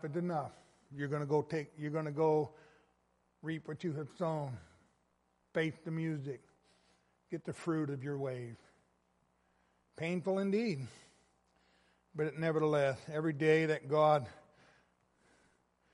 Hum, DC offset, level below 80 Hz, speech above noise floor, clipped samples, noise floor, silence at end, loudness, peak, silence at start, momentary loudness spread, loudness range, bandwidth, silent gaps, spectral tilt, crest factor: none; under 0.1%; -76 dBFS; 42 dB; under 0.1%; -77 dBFS; 1.55 s; -36 LUFS; -16 dBFS; 0.05 s; 16 LU; 9 LU; 11.5 kHz; none; -7.5 dB/octave; 20 dB